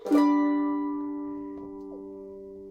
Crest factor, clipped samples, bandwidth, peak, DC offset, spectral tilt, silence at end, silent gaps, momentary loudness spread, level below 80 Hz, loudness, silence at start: 16 dB; under 0.1%; 8.4 kHz; -12 dBFS; under 0.1%; -6 dB/octave; 0 s; none; 20 LU; -64 dBFS; -27 LUFS; 0 s